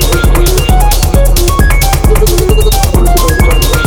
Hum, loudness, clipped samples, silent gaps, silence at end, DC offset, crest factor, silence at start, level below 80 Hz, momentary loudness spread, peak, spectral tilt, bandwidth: none; -9 LUFS; 0.2%; none; 0 s; under 0.1%; 6 dB; 0 s; -8 dBFS; 0 LU; 0 dBFS; -4.5 dB/octave; 19.5 kHz